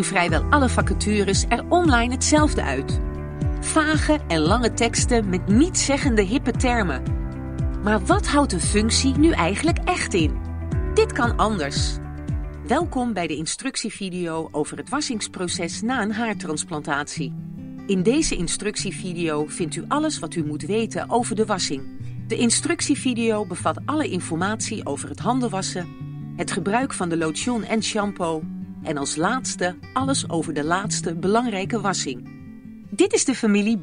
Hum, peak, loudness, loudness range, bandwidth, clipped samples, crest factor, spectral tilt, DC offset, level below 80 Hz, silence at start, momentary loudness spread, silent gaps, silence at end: none; -4 dBFS; -22 LUFS; 5 LU; 10.5 kHz; under 0.1%; 18 dB; -4.5 dB/octave; under 0.1%; -32 dBFS; 0 s; 10 LU; none; 0 s